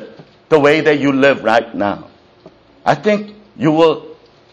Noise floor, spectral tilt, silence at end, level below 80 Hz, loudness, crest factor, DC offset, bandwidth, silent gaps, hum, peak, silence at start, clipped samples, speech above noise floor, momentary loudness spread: -45 dBFS; -6 dB/octave; 0.4 s; -56 dBFS; -14 LUFS; 16 dB; under 0.1%; 9.2 kHz; none; none; 0 dBFS; 0 s; under 0.1%; 32 dB; 10 LU